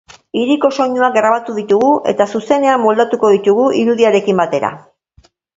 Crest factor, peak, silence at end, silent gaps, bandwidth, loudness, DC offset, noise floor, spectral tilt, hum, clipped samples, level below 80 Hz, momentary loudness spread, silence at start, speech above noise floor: 14 dB; 0 dBFS; 0.8 s; none; 7.8 kHz; -13 LUFS; under 0.1%; -51 dBFS; -5.5 dB/octave; none; under 0.1%; -58 dBFS; 6 LU; 0.35 s; 39 dB